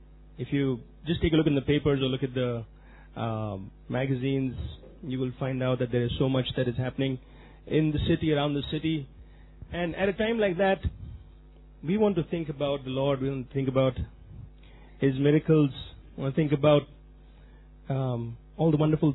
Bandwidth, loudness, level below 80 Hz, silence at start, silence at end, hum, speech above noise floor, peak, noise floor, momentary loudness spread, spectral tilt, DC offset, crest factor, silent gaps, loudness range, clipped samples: 4.1 kHz; -28 LUFS; -46 dBFS; 0 s; 0 s; none; 24 dB; -8 dBFS; -51 dBFS; 16 LU; -11 dB/octave; under 0.1%; 20 dB; none; 3 LU; under 0.1%